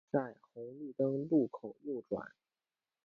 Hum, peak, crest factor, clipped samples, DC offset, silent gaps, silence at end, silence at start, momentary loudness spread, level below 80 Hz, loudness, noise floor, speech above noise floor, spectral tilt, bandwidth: none; -20 dBFS; 18 dB; under 0.1%; under 0.1%; none; 0.75 s; 0.15 s; 16 LU; -78 dBFS; -37 LUFS; under -90 dBFS; over 53 dB; -10 dB/octave; 4.4 kHz